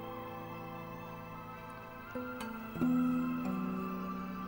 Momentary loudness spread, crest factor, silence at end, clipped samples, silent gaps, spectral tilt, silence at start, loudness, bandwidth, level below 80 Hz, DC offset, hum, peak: 14 LU; 18 dB; 0 s; under 0.1%; none; -7.5 dB/octave; 0 s; -39 LUFS; 16.5 kHz; -62 dBFS; under 0.1%; none; -20 dBFS